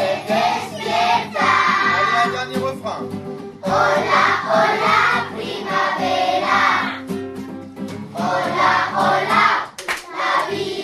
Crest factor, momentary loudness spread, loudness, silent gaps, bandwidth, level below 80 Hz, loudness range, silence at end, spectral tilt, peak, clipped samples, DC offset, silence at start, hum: 16 dB; 13 LU; -18 LUFS; none; 13.5 kHz; -60 dBFS; 2 LU; 0 s; -4 dB/octave; -2 dBFS; under 0.1%; under 0.1%; 0 s; none